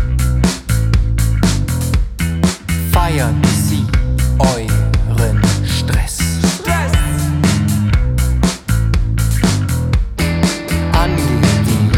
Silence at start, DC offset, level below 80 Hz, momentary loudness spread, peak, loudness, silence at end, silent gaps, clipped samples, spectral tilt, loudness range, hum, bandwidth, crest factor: 0 s; under 0.1%; -18 dBFS; 3 LU; 0 dBFS; -15 LUFS; 0 s; none; under 0.1%; -5.5 dB/octave; 1 LU; none; 18 kHz; 14 dB